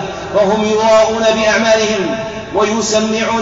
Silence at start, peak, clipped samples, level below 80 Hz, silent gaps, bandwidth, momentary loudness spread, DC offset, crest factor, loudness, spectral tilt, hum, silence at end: 0 s; -2 dBFS; under 0.1%; -42 dBFS; none; 8 kHz; 7 LU; under 0.1%; 10 dB; -13 LUFS; -3.5 dB/octave; none; 0 s